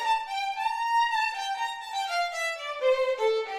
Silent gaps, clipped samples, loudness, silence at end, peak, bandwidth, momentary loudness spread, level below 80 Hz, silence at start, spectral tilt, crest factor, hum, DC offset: none; under 0.1%; -28 LUFS; 0 s; -14 dBFS; 15.5 kHz; 6 LU; -68 dBFS; 0 s; 1.5 dB/octave; 14 dB; none; under 0.1%